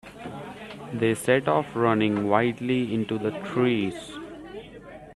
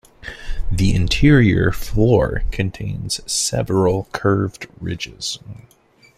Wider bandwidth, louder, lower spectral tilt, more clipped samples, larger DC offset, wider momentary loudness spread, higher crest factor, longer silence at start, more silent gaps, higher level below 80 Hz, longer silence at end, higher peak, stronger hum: second, 13 kHz vs 15.5 kHz; second, -25 LUFS vs -19 LUFS; about the same, -6 dB/octave vs -5.5 dB/octave; neither; neither; about the same, 18 LU vs 17 LU; about the same, 20 dB vs 16 dB; second, 0.05 s vs 0.25 s; neither; second, -60 dBFS vs -28 dBFS; second, 0 s vs 0.65 s; second, -6 dBFS vs -2 dBFS; neither